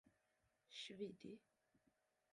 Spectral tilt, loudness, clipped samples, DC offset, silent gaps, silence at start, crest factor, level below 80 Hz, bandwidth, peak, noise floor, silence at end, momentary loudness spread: -4 dB/octave; -55 LUFS; under 0.1%; under 0.1%; none; 0.05 s; 22 dB; under -90 dBFS; 11 kHz; -38 dBFS; -86 dBFS; 0.95 s; 9 LU